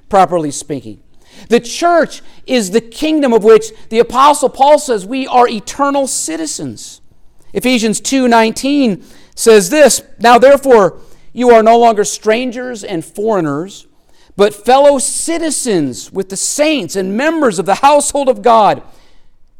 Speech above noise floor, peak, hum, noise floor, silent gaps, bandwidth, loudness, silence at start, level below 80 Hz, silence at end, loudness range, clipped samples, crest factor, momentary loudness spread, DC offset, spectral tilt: 28 dB; 0 dBFS; none; -39 dBFS; none; 17 kHz; -11 LUFS; 0.1 s; -44 dBFS; 0.4 s; 5 LU; under 0.1%; 12 dB; 14 LU; under 0.1%; -3.5 dB/octave